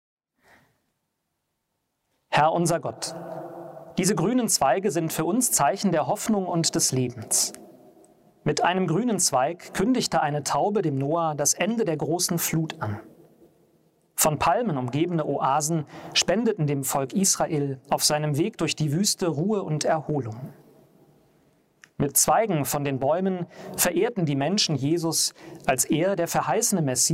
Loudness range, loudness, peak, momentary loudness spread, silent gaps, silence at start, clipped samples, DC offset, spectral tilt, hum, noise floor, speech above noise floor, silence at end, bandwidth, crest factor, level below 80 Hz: 3 LU; -24 LUFS; -6 dBFS; 9 LU; none; 2.3 s; under 0.1%; under 0.1%; -4 dB/octave; none; -78 dBFS; 54 dB; 0 s; 16 kHz; 20 dB; -60 dBFS